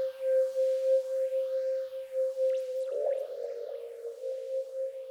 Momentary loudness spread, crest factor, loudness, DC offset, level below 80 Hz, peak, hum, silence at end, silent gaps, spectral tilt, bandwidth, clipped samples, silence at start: 10 LU; 12 dB; -32 LUFS; under 0.1%; -90 dBFS; -20 dBFS; none; 0 s; none; -1.5 dB/octave; 12.5 kHz; under 0.1%; 0 s